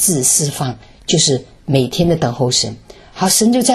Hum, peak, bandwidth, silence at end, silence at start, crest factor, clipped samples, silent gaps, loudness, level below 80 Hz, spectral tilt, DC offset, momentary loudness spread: none; 0 dBFS; 13.5 kHz; 0 s; 0 s; 16 dB; under 0.1%; none; -15 LUFS; -42 dBFS; -3.5 dB/octave; under 0.1%; 11 LU